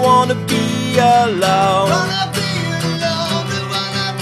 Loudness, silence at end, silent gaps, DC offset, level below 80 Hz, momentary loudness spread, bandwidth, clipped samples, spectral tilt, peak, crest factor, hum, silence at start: -16 LUFS; 0 s; none; under 0.1%; -52 dBFS; 7 LU; 14 kHz; under 0.1%; -4.5 dB/octave; 0 dBFS; 16 dB; none; 0 s